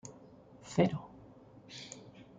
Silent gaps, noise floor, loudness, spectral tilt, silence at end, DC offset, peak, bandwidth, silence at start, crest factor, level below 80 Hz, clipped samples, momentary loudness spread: none; -57 dBFS; -35 LUFS; -6 dB/octave; 0.15 s; under 0.1%; -14 dBFS; 9.4 kHz; 0.05 s; 24 dB; -68 dBFS; under 0.1%; 26 LU